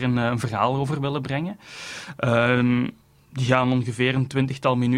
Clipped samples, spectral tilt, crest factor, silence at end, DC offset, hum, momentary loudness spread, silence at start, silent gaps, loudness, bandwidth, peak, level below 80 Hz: under 0.1%; -6.5 dB/octave; 20 dB; 0 s; under 0.1%; none; 14 LU; 0 s; none; -23 LUFS; 11.5 kHz; -4 dBFS; -54 dBFS